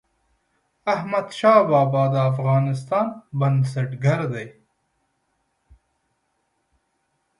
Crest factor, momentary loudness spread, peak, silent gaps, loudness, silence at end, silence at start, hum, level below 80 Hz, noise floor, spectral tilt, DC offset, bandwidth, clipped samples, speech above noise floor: 20 dB; 11 LU; -2 dBFS; none; -21 LUFS; 2.9 s; 0.85 s; none; -62 dBFS; -72 dBFS; -8 dB/octave; under 0.1%; 11 kHz; under 0.1%; 52 dB